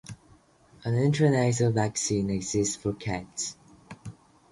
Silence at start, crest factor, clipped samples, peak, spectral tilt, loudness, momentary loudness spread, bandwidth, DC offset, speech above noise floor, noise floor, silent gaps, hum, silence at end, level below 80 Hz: 0.1 s; 16 dB; under 0.1%; -12 dBFS; -5.5 dB/octave; -27 LUFS; 22 LU; 11.5 kHz; under 0.1%; 33 dB; -59 dBFS; none; none; 0.4 s; -54 dBFS